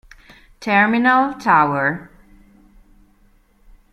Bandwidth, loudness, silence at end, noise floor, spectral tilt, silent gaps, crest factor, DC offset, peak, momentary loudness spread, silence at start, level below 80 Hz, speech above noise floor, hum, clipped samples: 13 kHz; -16 LUFS; 1.9 s; -55 dBFS; -6 dB/octave; none; 20 dB; under 0.1%; -2 dBFS; 11 LU; 0.6 s; -52 dBFS; 39 dB; none; under 0.1%